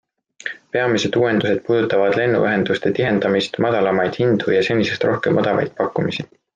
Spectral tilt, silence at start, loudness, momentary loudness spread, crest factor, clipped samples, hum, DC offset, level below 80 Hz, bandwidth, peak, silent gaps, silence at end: -6 dB/octave; 0.45 s; -18 LUFS; 6 LU; 14 dB; under 0.1%; none; under 0.1%; -58 dBFS; 9.2 kHz; -4 dBFS; none; 0.3 s